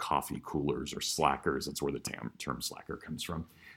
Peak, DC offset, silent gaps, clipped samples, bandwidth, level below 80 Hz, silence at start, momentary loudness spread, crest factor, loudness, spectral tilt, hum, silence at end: -12 dBFS; under 0.1%; none; under 0.1%; 17 kHz; -56 dBFS; 0 s; 10 LU; 24 dB; -35 LUFS; -4 dB/octave; none; 0 s